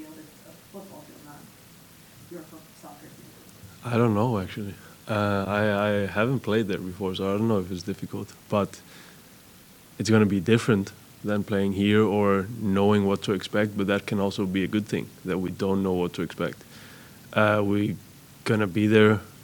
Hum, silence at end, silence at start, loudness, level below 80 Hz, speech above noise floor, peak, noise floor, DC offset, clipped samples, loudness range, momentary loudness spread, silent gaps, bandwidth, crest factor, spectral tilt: none; 0 s; 0 s; -25 LUFS; -62 dBFS; 26 dB; -6 dBFS; -51 dBFS; under 0.1%; under 0.1%; 6 LU; 23 LU; none; 19 kHz; 20 dB; -6.5 dB/octave